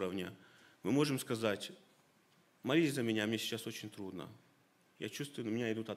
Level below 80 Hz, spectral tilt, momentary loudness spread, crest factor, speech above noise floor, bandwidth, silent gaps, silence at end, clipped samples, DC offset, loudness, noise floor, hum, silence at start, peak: -82 dBFS; -5 dB/octave; 14 LU; 20 dB; 33 dB; 16 kHz; none; 0 s; under 0.1%; under 0.1%; -38 LUFS; -71 dBFS; none; 0 s; -18 dBFS